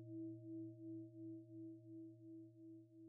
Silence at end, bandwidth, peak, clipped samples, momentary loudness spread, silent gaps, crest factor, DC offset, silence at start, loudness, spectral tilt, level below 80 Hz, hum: 0 s; 0.7 kHz; -44 dBFS; under 0.1%; 8 LU; none; 10 dB; under 0.1%; 0 s; -56 LUFS; -3 dB/octave; under -90 dBFS; none